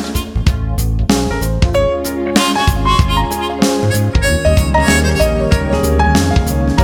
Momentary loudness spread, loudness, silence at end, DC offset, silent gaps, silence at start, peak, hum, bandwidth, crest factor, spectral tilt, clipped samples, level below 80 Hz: 5 LU; -14 LUFS; 0 s; under 0.1%; none; 0 s; 0 dBFS; none; 18 kHz; 12 dB; -5 dB/octave; under 0.1%; -18 dBFS